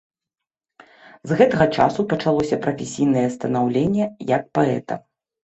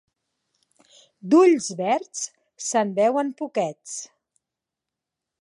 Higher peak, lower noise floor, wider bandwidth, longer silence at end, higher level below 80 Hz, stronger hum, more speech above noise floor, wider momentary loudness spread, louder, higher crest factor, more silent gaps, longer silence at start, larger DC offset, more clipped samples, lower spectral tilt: first, -2 dBFS vs -6 dBFS; about the same, -86 dBFS vs -86 dBFS; second, 8.2 kHz vs 11 kHz; second, 0.5 s vs 1.35 s; first, -52 dBFS vs -80 dBFS; neither; about the same, 66 dB vs 65 dB; second, 8 LU vs 18 LU; about the same, -20 LUFS vs -22 LUFS; about the same, 20 dB vs 18 dB; neither; about the same, 1.25 s vs 1.25 s; neither; neither; first, -6.5 dB/octave vs -4.5 dB/octave